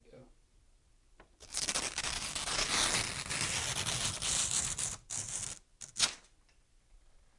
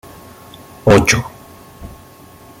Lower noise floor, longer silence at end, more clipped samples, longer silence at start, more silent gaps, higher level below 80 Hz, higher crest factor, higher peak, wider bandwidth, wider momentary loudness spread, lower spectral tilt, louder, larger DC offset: first, -66 dBFS vs -41 dBFS; second, 0.3 s vs 0.7 s; neither; second, 0.1 s vs 0.85 s; neither; second, -56 dBFS vs -36 dBFS; first, 24 dB vs 18 dB; second, -14 dBFS vs 0 dBFS; second, 11.5 kHz vs 17 kHz; second, 10 LU vs 26 LU; second, -0.5 dB/octave vs -4.5 dB/octave; second, -33 LUFS vs -13 LUFS; neither